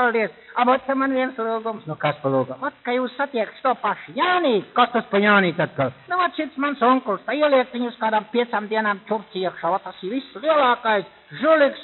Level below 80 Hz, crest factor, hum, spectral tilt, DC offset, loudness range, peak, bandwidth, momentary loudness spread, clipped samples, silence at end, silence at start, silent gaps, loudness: -70 dBFS; 20 dB; none; -3 dB/octave; under 0.1%; 3 LU; -2 dBFS; 4.3 kHz; 9 LU; under 0.1%; 0 s; 0 s; none; -21 LUFS